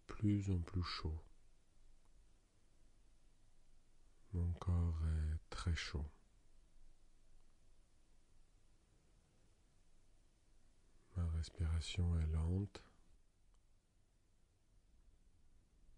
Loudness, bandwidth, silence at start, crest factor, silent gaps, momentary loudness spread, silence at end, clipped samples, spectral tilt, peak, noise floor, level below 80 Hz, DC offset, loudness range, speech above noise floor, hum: -42 LUFS; 10.5 kHz; 0.1 s; 18 dB; none; 10 LU; 0 s; under 0.1%; -6.5 dB/octave; -26 dBFS; -74 dBFS; -54 dBFS; under 0.1%; 9 LU; 34 dB; none